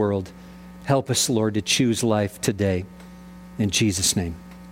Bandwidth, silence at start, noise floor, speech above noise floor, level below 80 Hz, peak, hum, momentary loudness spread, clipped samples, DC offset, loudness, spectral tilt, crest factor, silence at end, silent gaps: 16.5 kHz; 0 s; -42 dBFS; 20 dB; -48 dBFS; -6 dBFS; none; 22 LU; under 0.1%; under 0.1%; -22 LUFS; -4 dB/octave; 18 dB; 0 s; none